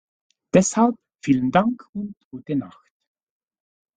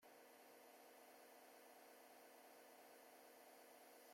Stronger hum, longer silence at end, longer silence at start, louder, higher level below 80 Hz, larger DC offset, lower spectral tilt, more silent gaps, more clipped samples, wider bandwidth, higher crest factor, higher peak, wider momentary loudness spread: neither; first, 1.3 s vs 0 s; first, 0.55 s vs 0 s; first, -21 LUFS vs -65 LUFS; first, -58 dBFS vs under -90 dBFS; neither; first, -5.5 dB/octave vs -1 dB/octave; first, 1.89-1.93 s, 2.25-2.31 s vs none; neither; second, 9.4 kHz vs 16.5 kHz; first, 22 dB vs 12 dB; first, -2 dBFS vs -54 dBFS; first, 16 LU vs 1 LU